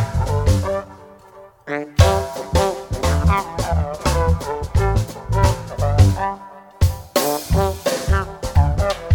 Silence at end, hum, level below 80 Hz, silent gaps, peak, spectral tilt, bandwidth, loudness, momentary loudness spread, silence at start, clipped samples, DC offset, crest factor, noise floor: 0 s; none; -24 dBFS; none; 0 dBFS; -5.5 dB/octave; 19 kHz; -20 LUFS; 8 LU; 0 s; under 0.1%; under 0.1%; 18 dB; -44 dBFS